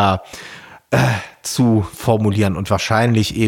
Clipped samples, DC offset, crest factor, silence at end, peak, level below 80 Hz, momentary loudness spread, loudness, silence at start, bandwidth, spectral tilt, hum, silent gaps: under 0.1%; under 0.1%; 14 dB; 0 s; -2 dBFS; -44 dBFS; 18 LU; -17 LUFS; 0 s; 17 kHz; -5.5 dB/octave; none; none